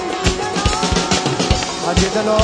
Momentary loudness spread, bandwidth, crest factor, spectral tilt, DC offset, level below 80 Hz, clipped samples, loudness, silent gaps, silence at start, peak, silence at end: 3 LU; 11 kHz; 16 dB; -4 dB/octave; under 0.1%; -26 dBFS; under 0.1%; -17 LUFS; none; 0 s; 0 dBFS; 0 s